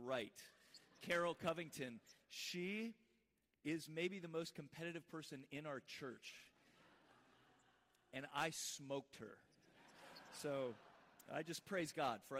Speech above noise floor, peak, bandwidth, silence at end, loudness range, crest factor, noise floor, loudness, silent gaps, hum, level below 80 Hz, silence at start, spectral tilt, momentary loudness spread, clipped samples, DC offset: 36 dB; -30 dBFS; 15.5 kHz; 0 s; 7 LU; 20 dB; -84 dBFS; -48 LUFS; none; none; -86 dBFS; 0 s; -4 dB/octave; 19 LU; under 0.1%; under 0.1%